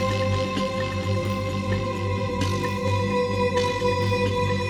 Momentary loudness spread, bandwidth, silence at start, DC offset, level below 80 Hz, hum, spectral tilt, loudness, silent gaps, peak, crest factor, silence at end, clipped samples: 4 LU; 15 kHz; 0 s; under 0.1%; -44 dBFS; 50 Hz at -40 dBFS; -6 dB/octave; -25 LUFS; none; -10 dBFS; 14 dB; 0 s; under 0.1%